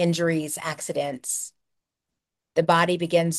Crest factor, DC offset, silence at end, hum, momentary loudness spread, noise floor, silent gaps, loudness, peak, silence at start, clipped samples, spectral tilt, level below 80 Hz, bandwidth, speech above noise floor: 20 dB; under 0.1%; 0 s; none; 9 LU; -85 dBFS; none; -24 LUFS; -6 dBFS; 0 s; under 0.1%; -4.5 dB/octave; -70 dBFS; 12.5 kHz; 61 dB